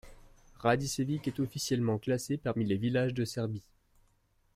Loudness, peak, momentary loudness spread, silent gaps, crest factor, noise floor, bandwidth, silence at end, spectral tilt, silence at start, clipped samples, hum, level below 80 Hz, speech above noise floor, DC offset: -32 LUFS; -14 dBFS; 5 LU; none; 18 dB; -71 dBFS; 16 kHz; 0.95 s; -5.5 dB/octave; 0.05 s; under 0.1%; none; -60 dBFS; 39 dB; under 0.1%